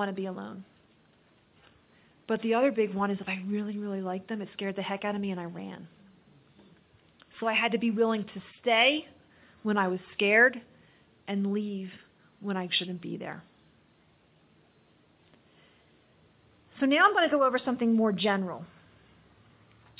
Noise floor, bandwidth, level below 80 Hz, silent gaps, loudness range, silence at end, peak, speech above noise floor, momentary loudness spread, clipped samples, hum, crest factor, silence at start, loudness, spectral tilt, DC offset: -64 dBFS; 4 kHz; -74 dBFS; none; 10 LU; 1.35 s; -10 dBFS; 36 dB; 19 LU; under 0.1%; none; 22 dB; 0 s; -28 LUFS; -3 dB/octave; under 0.1%